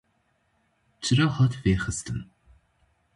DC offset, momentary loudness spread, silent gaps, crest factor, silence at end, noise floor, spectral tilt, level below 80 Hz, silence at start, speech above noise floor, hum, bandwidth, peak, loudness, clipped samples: under 0.1%; 12 LU; none; 18 dB; 0.9 s; -70 dBFS; -5.5 dB/octave; -46 dBFS; 1 s; 46 dB; none; 11.5 kHz; -10 dBFS; -25 LUFS; under 0.1%